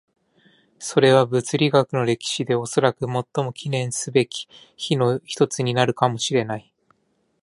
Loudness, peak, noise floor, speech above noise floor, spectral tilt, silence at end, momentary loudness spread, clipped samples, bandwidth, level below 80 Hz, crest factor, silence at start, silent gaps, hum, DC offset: -21 LUFS; -2 dBFS; -68 dBFS; 47 dB; -5 dB/octave; 0.85 s; 9 LU; under 0.1%; 11.5 kHz; -64 dBFS; 20 dB; 0.8 s; none; none; under 0.1%